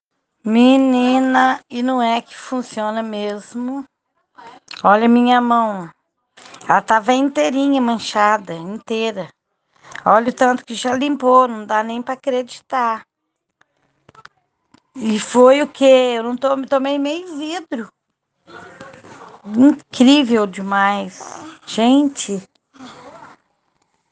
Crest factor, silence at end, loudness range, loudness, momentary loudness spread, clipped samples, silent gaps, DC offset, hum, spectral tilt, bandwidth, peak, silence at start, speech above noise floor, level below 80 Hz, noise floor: 18 dB; 0.85 s; 6 LU; -16 LUFS; 17 LU; under 0.1%; none; under 0.1%; none; -4.5 dB/octave; 9.6 kHz; 0 dBFS; 0.45 s; 60 dB; -66 dBFS; -76 dBFS